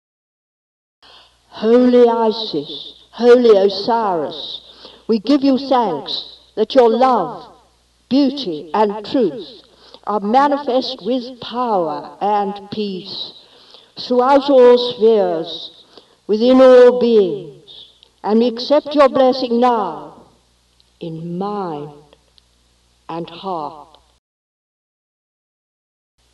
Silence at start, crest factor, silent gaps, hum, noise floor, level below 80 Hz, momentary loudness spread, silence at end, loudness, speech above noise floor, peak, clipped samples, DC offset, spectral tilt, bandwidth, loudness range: 1.55 s; 16 dB; none; none; -57 dBFS; -58 dBFS; 20 LU; 2.5 s; -15 LUFS; 43 dB; 0 dBFS; under 0.1%; under 0.1%; -6.5 dB/octave; 7.6 kHz; 16 LU